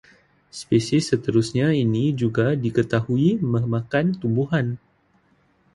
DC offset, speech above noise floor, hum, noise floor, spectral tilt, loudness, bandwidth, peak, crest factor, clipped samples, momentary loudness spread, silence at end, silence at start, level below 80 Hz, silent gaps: under 0.1%; 41 dB; none; -62 dBFS; -7 dB/octave; -22 LUFS; 11.5 kHz; -6 dBFS; 16 dB; under 0.1%; 4 LU; 1 s; 0.55 s; -54 dBFS; none